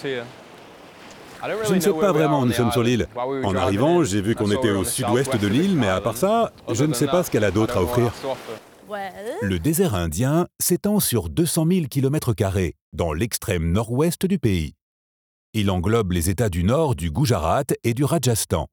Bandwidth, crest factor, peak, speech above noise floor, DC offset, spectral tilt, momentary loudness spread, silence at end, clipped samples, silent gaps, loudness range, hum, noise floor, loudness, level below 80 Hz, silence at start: over 20 kHz; 16 dB; -6 dBFS; 23 dB; under 0.1%; -5.5 dB/octave; 10 LU; 0.05 s; under 0.1%; 12.81-12.92 s, 14.82-15.53 s; 3 LU; none; -44 dBFS; -21 LUFS; -42 dBFS; 0 s